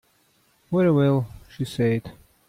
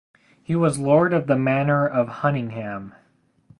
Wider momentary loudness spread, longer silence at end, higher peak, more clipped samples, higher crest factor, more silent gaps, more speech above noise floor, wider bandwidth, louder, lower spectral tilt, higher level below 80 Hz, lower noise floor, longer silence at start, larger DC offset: about the same, 13 LU vs 13 LU; second, 0.4 s vs 0.7 s; second, -10 dBFS vs -4 dBFS; neither; about the same, 14 dB vs 18 dB; neither; first, 42 dB vs 36 dB; first, 15 kHz vs 11.5 kHz; about the same, -23 LUFS vs -21 LUFS; about the same, -8 dB/octave vs -7.5 dB/octave; about the same, -54 dBFS vs -58 dBFS; first, -63 dBFS vs -57 dBFS; first, 0.7 s vs 0.5 s; neither